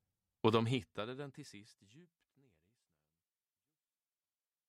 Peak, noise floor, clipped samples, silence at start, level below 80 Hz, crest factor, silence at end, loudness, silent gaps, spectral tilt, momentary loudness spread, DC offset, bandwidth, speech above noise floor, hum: -16 dBFS; under -90 dBFS; under 0.1%; 0.45 s; -78 dBFS; 28 dB; 2.65 s; -37 LUFS; none; -6.5 dB/octave; 22 LU; under 0.1%; 13 kHz; over 51 dB; none